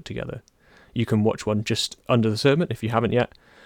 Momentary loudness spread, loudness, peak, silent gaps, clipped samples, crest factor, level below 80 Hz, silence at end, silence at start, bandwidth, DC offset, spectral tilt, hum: 13 LU; -23 LUFS; -6 dBFS; none; under 0.1%; 18 dB; -52 dBFS; 0.4 s; 0.05 s; 17 kHz; under 0.1%; -6 dB/octave; none